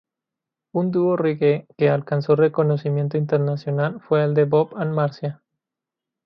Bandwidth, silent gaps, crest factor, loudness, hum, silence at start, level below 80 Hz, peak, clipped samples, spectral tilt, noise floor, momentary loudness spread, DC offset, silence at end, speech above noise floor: 5.8 kHz; none; 16 dB; -21 LUFS; none; 0.75 s; -66 dBFS; -4 dBFS; under 0.1%; -10 dB/octave; -86 dBFS; 6 LU; under 0.1%; 0.9 s; 67 dB